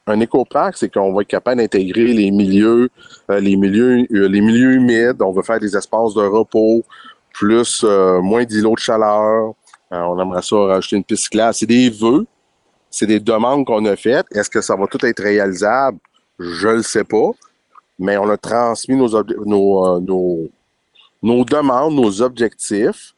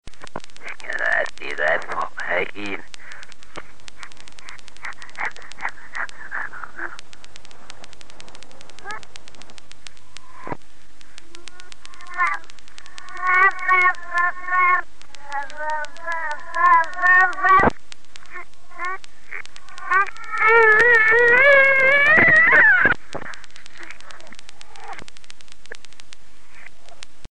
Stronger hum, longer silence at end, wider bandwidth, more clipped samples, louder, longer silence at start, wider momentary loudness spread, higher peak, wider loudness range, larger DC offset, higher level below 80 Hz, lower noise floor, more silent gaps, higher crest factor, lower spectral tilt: neither; about the same, 0.1 s vs 0 s; first, 11.5 kHz vs 10 kHz; neither; about the same, -15 LUFS vs -16 LUFS; about the same, 0.05 s vs 0 s; second, 7 LU vs 27 LU; about the same, -2 dBFS vs -4 dBFS; second, 3 LU vs 22 LU; second, under 0.1% vs 6%; about the same, -54 dBFS vs -52 dBFS; first, -62 dBFS vs -52 dBFS; neither; second, 12 dB vs 20 dB; first, -5 dB/octave vs -3.5 dB/octave